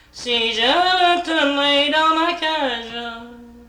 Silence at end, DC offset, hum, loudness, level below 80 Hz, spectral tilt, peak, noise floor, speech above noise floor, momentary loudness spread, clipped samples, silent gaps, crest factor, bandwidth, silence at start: 0.05 s; under 0.1%; none; -17 LUFS; -52 dBFS; -2 dB/octave; -6 dBFS; -39 dBFS; 22 dB; 13 LU; under 0.1%; none; 14 dB; 14 kHz; 0.15 s